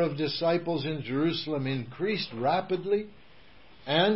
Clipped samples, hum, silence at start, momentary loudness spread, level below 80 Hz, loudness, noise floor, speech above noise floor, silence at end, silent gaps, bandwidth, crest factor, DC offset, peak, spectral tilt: under 0.1%; none; 0 s; 4 LU; -62 dBFS; -29 LUFS; -56 dBFS; 28 dB; 0 s; none; 5.8 kHz; 18 dB; 0.3%; -12 dBFS; -9.5 dB/octave